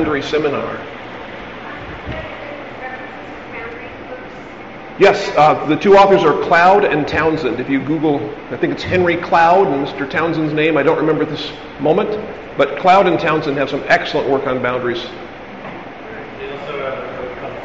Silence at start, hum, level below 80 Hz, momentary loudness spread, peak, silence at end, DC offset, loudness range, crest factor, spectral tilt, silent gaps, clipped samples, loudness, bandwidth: 0 s; none; -46 dBFS; 19 LU; -2 dBFS; 0 s; 0.4%; 15 LU; 16 dB; -3.5 dB/octave; none; under 0.1%; -15 LUFS; 7.8 kHz